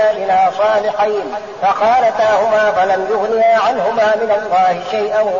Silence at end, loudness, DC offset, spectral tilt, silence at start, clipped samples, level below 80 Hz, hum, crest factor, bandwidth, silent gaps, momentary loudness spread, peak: 0 s; -14 LUFS; 0.2%; -1.5 dB/octave; 0 s; under 0.1%; -54 dBFS; none; 10 dB; 7.4 kHz; none; 5 LU; -4 dBFS